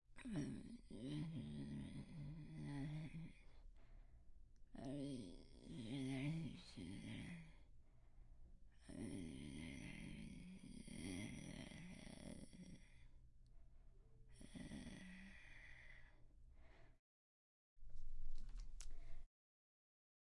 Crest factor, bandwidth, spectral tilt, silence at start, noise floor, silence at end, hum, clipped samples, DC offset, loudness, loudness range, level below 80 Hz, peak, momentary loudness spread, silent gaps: 18 dB; 11.5 kHz; -6 dB/octave; 0.1 s; under -90 dBFS; 1 s; none; under 0.1%; under 0.1%; -54 LUFS; 11 LU; -60 dBFS; -34 dBFS; 14 LU; 16.99-17.76 s